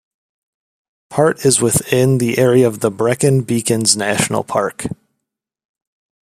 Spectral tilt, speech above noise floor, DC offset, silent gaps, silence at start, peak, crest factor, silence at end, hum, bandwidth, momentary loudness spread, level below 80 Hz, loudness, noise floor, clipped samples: -4.5 dB/octave; 64 dB; under 0.1%; none; 1.1 s; 0 dBFS; 16 dB; 1.35 s; none; 15.5 kHz; 9 LU; -52 dBFS; -15 LUFS; -79 dBFS; under 0.1%